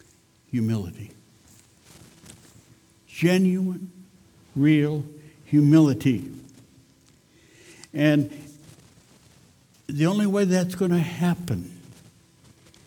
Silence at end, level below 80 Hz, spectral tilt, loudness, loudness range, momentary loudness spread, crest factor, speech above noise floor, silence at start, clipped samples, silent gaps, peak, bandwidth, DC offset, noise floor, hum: 1.1 s; -60 dBFS; -7 dB/octave; -23 LUFS; 7 LU; 22 LU; 20 dB; 37 dB; 0.55 s; under 0.1%; none; -6 dBFS; 17.5 kHz; under 0.1%; -58 dBFS; none